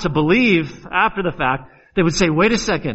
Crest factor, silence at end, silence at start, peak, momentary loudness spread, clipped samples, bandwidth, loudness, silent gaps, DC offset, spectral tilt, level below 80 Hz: 16 dB; 0 s; 0 s; -2 dBFS; 7 LU; under 0.1%; 8.2 kHz; -17 LUFS; none; under 0.1%; -5 dB/octave; -38 dBFS